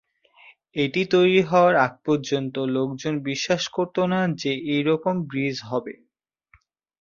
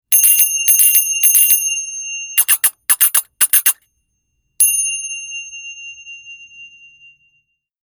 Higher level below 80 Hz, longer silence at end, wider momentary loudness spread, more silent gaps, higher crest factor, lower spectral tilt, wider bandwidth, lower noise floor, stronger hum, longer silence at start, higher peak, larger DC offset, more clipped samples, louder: first, -64 dBFS vs -70 dBFS; about the same, 1.1 s vs 1.2 s; second, 9 LU vs 21 LU; neither; about the same, 18 dB vs 16 dB; first, -5.5 dB/octave vs 5 dB/octave; second, 7.4 kHz vs over 20 kHz; second, -63 dBFS vs -68 dBFS; neither; first, 0.75 s vs 0.1 s; second, -4 dBFS vs 0 dBFS; neither; neither; second, -23 LUFS vs -11 LUFS